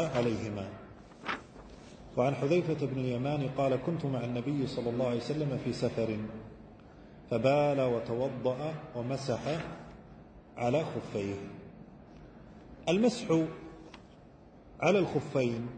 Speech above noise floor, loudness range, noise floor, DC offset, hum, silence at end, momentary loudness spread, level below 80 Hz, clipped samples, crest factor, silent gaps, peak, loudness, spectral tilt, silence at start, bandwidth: 24 dB; 4 LU; -55 dBFS; under 0.1%; none; 0 s; 24 LU; -60 dBFS; under 0.1%; 20 dB; none; -12 dBFS; -32 LUFS; -7 dB/octave; 0 s; 9.2 kHz